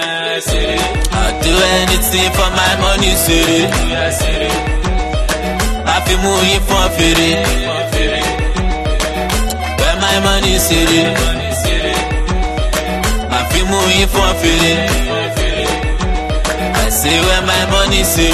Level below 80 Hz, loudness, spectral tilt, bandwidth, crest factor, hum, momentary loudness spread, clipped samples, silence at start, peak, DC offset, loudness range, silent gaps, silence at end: -18 dBFS; -13 LUFS; -3.5 dB/octave; 13.5 kHz; 12 dB; none; 6 LU; under 0.1%; 0 s; 0 dBFS; under 0.1%; 2 LU; none; 0 s